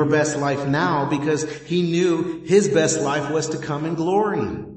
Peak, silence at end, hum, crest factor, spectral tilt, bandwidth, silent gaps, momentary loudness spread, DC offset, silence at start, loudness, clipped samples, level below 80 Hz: -4 dBFS; 0 s; none; 18 dB; -5 dB/octave; 8.8 kHz; none; 6 LU; under 0.1%; 0 s; -21 LUFS; under 0.1%; -54 dBFS